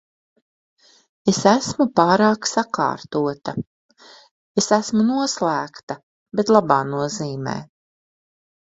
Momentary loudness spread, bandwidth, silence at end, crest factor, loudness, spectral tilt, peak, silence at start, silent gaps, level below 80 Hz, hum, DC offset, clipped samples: 15 LU; 8.2 kHz; 1 s; 22 dB; -20 LUFS; -4.5 dB/octave; 0 dBFS; 1.25 s; 3.67-3.89 s, 4.31-4.55 s, 5.83-5.87 s, 6.03-6.26 s; -60 dBFS; none; under 0.1%; under 0.1%